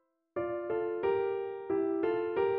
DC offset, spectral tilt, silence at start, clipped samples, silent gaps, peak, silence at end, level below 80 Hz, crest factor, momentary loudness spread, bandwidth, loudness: under 0.1%; -5 dB/octave; 0.35 s; under 0.1%; none; -18 dBFS; 0 s; -68 dBFS; 14 dB; 6 LU; 4.3 kHz; -33 LUFS